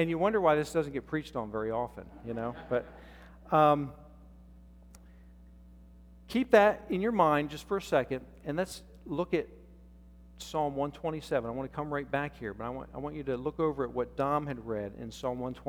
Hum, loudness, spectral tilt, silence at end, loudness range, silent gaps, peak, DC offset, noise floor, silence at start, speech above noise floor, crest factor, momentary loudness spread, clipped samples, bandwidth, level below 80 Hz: none; -31 LUFS; -6.5 dB/octave; 0 s; 6 LU; none; -8 dBFS; under 0.1%; -54 dBFS; 0 s; 23 dB; 24 dB; 14 LU; under 0.1%; 18 kHz; -54 dBFS